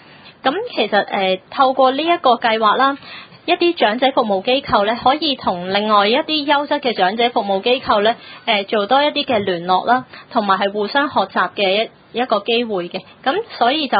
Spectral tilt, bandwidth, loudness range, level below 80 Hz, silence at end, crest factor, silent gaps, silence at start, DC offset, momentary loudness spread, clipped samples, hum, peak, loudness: -9.5 dB/octave; 5 kHz; 2 LU; -56 dBFS; 0 s; 16 dB; none; 0.25 s; under 0.1%; 6 LU; under 0.1%; none; 0 dBFS; -17 LUFS